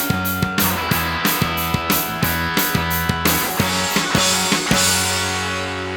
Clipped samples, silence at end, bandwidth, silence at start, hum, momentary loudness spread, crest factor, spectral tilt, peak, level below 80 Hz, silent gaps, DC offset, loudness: under 0.1%; 0 s; 19.5 kHz; 0 s; none; 5 LU; 16 dB; -3 dB/octave; -2 dBFS; -38 dBFS; none; under 0.1%; -18 LUFS